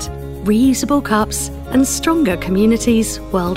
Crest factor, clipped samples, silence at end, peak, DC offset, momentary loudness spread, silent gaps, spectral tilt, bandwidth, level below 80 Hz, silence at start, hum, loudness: 12 dB; under 0.1%; 0 s; -4 dBFS; under 0.1%; 6 LU; none; -4.5 dB/octave; 16.5 kHz; -32 dBFS; 0 s; none; -16 LUFS